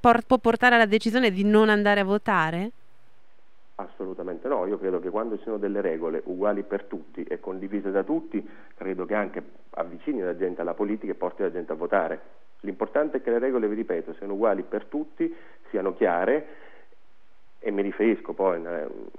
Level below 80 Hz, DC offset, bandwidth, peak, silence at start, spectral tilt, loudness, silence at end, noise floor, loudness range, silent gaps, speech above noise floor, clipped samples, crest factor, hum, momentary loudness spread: -62 dBFS; 0.8%; 12.5 kHz; -4 dBFS; 0.05 s; -6.5 dB/octave; -26 LUFS; 0.15 s; -65 dBFS; 7 LU; none; 39 dB; under 0.1%; 22 dB; none; 15 LU